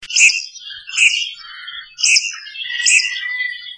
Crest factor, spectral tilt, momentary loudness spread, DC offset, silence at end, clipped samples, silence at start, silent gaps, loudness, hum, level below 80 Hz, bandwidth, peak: 18 dB; 6 dB/octave; 19 LU; under 0.1%; 0 s; under 0.1%; 0 s; none; -14 LUFS; none; -64 dBFS; 10.5 kHz; 0 dBFS